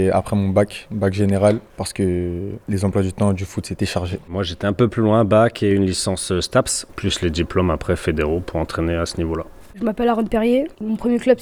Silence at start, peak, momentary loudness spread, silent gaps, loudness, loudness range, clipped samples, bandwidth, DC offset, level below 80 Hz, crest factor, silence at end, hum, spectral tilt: 0 s; -2 dBFS; 9 LU; none; -20 LUFS; 3 LU; under 0.1%; 18 kHz; under 0.1%; -38 dBFS; 16 dB; 0 s; none; -5.5 dB/octave